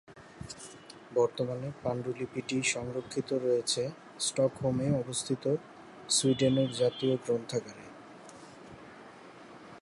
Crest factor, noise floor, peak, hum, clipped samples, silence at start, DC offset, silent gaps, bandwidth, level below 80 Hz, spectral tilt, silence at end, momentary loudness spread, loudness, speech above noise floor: 18 dB; -51 dBFS; -14 dBFS; none; under 0.1%; 0.1 s; under 0.1%; none; 11.5 kHz; -64 dBFS; -4.5 dB/octave; 0 s; 22 LU; -31 LUFS; 20 dB